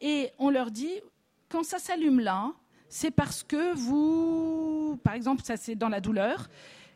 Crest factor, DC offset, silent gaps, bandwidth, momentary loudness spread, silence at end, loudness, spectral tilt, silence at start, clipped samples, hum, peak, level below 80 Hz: 20 dB; under 0.1%; none; 15.5 kHz; 10 LU; 0.1 s; -29 LUFS; -5.5 dB/octave; 0 s; under 0.1%; none; -8 dBFS; -56 dBFS